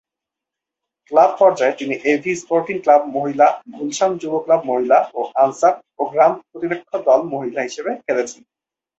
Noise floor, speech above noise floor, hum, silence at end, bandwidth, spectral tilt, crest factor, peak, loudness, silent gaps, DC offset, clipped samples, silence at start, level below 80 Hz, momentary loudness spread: -85 dBFS; 68 dB; none; 0.65 s; 8.2 kHz; -4.5 dB/octave; 18 dB; 0 dBFS; -18 LUFS; none; under 0.1%; under 0.1%; 1.1 s; -66 dBFS; 10 LU